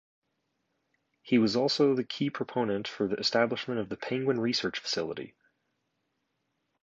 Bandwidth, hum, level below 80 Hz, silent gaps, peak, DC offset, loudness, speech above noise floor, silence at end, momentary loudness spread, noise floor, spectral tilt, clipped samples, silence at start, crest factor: 7.8 kHz; none; -70 dBFS; none; -12 dBFS; under 0.1%; -29 LUFS; 50 dB; 1.55 s; 9 LU; -79 dBFS; -5 dB/octave; under 0.1%; 1.25 s; 20 dB